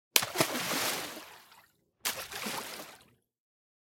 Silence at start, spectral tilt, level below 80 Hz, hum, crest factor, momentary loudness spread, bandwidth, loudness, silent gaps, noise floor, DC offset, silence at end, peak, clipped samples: 0.15 s; -1 dB/octave; -74 dBFS; none; 34 dB; 18 LU; 17 kHz; -32 LUFS; none; -64 dBFS; under 0.1%; 0.9 s; -2 dBFS; under 0.1%